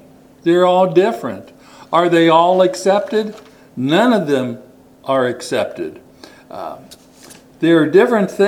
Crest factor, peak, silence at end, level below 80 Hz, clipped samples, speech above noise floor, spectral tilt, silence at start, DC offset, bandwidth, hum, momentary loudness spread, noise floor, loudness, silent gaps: 16 dB; 0 dBFS; 0 s; -62 dBFS; under 0.1%; 28 dB; -6 dB/octave; 0.45 s; under 0.1%; 15 kHz; none; 19 LU; -42 dBFS; -15 LUFS; none